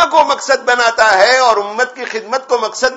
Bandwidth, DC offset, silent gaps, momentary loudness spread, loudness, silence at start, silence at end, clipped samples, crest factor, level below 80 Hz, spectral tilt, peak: 11 kHz; under 0.1%; none; 10 LU; -12 LUFS; 0 s; 0 s; 0.2%; 12 dB; -54 dBFS; -0.5 dB/octave; 0 dBFS